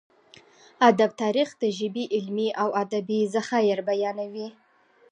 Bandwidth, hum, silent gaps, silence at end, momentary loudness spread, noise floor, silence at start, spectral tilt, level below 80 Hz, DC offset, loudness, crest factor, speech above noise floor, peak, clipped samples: 10 kHz; none; none; 0.6 s; 10 LU; -60 dBFS; 0.8 s; -5 dB/octave; -80 dBFS; under 0.1%; -25 LUFS; 22 dB; 36 dB; -4 dBFS; under 0.1%